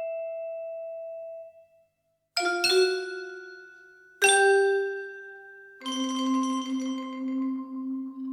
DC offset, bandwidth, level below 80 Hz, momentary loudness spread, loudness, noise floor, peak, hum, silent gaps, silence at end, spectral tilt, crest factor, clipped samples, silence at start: under 0.1%; 16 kHz; -84 dBFS; 21 LU; -27 LUFS; -75 dBFS; -8 dBFS; 50 Hz at -85 dBFS; none; 0 s; -0.5 dB/octave; 22 dB; under 0.1%; 0 s